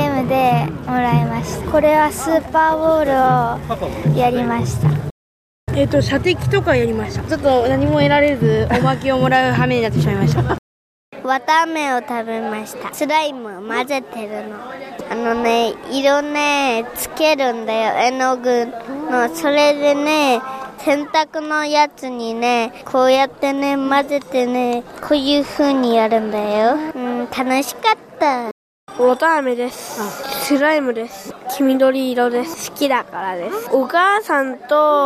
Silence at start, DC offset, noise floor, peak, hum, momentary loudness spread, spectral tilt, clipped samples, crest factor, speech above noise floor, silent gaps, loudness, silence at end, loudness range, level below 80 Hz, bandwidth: 0 s; under 0.1%; under -90 dBFS; -2 dBFS; none; 10 LU; -5.5 dB/octave; under 0.1%; 14 dB; over 73 dB; 5.11-5.67 s, 10.58-11.12 s, 28.51-28.87 s; -17 LUFS; 0 s; 4 LU; -42 dBFS; 15.5 kHz